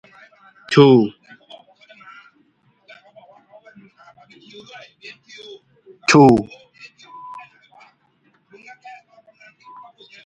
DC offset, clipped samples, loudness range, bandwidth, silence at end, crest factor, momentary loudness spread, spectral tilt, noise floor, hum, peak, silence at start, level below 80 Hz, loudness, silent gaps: under 0.1%; under 0.1%; 23 LU; 9.4 kHz; 2.85 s; 22 dB; 30 LU; -6 dB/octave; -61 dBFS; none; 0 dBFS; 0.7 s; -58 dBFS; -14 LUFS; none